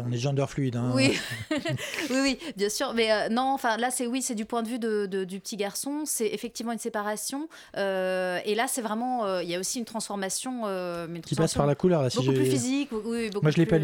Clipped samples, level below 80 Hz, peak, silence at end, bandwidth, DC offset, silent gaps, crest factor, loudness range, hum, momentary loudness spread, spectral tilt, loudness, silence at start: under 0.1%; -58 dBFS; -10 dBFS; 0 s; 19 kHz; under 0.1%; none; 18 dB; 4 LU; none; 8 LU; -4.5 dB/octave; -28 LUFS; 0 s